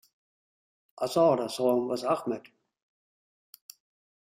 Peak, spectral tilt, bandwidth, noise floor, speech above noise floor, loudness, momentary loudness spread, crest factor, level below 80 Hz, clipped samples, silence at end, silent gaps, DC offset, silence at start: -12 dBFS; -5.5 dB/octave; 16 kHz; under -90 dBFS; over 63 dB; -28 LUFS; 12 LU; 18 dB; -76 dBFS; under 0.1%; 1.8 s; none; under 0.1%; 1 s